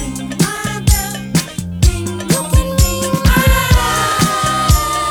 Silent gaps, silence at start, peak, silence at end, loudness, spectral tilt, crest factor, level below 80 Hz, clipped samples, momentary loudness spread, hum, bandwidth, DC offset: none; 0 s; 0 dBFS; 0 s; -14 LUFS; -4 dB/octave; 14 dB; -18 dBFS; under 0.1%; 6 LU; none; over 20 kHz; under 0.1%